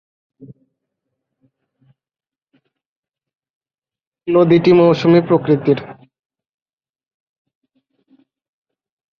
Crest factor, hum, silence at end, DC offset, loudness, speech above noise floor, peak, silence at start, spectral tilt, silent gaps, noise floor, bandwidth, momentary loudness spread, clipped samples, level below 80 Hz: 18 dB; none; 3.25 s; under 0.1%; -13 LUFS; over 78 dB; -2 dBFS; 0.4 s; -8.5 dB/octave; 2.86-3.03 s, 3.50-3.61 s, 4.07-4.12 s; under -90 dBFS; 6.6 kHz; 11 LU; under 0.1%; -58 dBFS